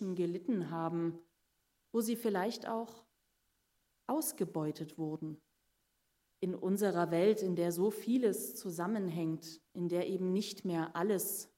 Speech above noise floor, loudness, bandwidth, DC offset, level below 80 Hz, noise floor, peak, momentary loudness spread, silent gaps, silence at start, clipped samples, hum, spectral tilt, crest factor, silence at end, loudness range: 44 dB; -36 LUFS; 16 kHz; under 0.1%; -84 dBFS; -80 dBFS; -18 dBFS; 9 LU; none; 0 s; under 0.1%; none; -5.5 dB/octave; 18 dB; 0.1 s; 7 LU